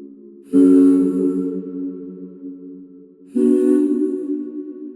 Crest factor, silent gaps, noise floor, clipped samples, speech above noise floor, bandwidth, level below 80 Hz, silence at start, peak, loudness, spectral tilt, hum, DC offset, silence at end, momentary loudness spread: 14 dB; none; -43 dBFS; under 0.1%; 29 dB; 11 kHz; -64 dBFS; 0 s; -4 dBFS; -17 LUFS; -9 dB/octave; none; under 0.1%; 0 s; 22 LU